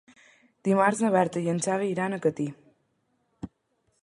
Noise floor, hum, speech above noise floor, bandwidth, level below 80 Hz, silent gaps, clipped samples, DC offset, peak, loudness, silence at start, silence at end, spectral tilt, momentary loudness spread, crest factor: -73 dBFS; none; 48 dB; 11.5 kHz; -66 dBFS; none; under 0.1%; under 0.1%; -8 dBFS; -26 LUFS; 0.65 s; 0.55 s; -6 dB/octave; 21 LU; 20 dB